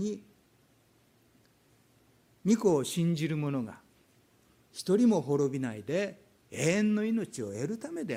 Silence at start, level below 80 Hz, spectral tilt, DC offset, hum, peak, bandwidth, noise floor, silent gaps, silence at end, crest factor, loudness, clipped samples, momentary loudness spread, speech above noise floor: 0 s; -72 dBFS; -6 dB/octave; under 0.1%; none; -14 dBFS; 16 kHz; -66 dBFS; none; 0 s; 18 dB; -30 LUFS; under 0.1%; 12 LU; 37 dB